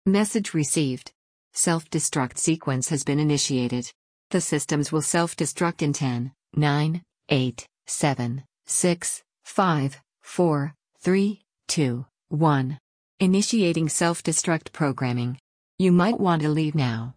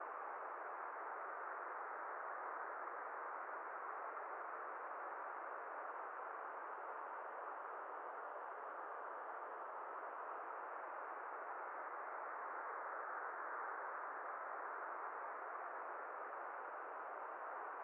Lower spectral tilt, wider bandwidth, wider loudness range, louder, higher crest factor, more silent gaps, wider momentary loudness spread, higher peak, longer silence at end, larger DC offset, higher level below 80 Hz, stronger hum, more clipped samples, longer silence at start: first, -5 dB/octave vs 9 dB/octave; first, 10.5 kHz vs 3.6 kHz; about the same, 2 LU vs 2 LU; first, -24 LUFS vs -48 LUFS; about the same, 16 dB vs 14 dB; first, 1.15-1.51 s, 3.95-4.30 s, 12.80-13.18 s, 15.40-15.78 s vs none; first, 10 LU vs 2 LU; first, -8 dBFS vs -36 dBFS; about the same, 0.05 s vs 0 s; neither; first, -60 dBFS vs under -90 dBFS; neither; neither; about the same, 0.05 s vs 0 s